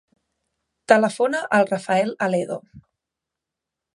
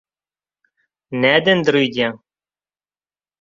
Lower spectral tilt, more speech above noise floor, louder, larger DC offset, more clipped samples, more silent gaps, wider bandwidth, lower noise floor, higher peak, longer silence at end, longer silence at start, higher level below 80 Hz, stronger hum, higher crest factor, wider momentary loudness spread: about the same, -5 dB/octave vs -5.5 dB/octave; second, 65 dB vs over 74 dB; second, -20 LUFS vs -16 LUFS; neither; neither; neither; first, 11.5 kHz vs 7.6 kHz; second, -85 dBFS vs under -90 dBFS; about the same, 0 dBFS vs -2 dBFS; about the same, 1.15 s vs 1.25 s; second, 0.9 s vs 1.1 s; second, -68 dBFS vs -62 dBFS; second, none vs 50 Hz at -50 dBFS; about the same, 22 dB vs 20 dB; about the same, 8 LU vs 9 LU